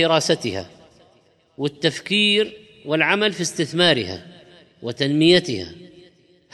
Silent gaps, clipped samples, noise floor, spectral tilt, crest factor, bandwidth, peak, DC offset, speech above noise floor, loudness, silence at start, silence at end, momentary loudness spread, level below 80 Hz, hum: none; under 0.1%; -58 dBFS; -4 dB/octave; 18 dB; 12.5 kHz; -4 dBFS; under 0.1%; 38 dB; -19 LUFS; 0 s; 0.65 s; 16 LU; -62 dBFS; none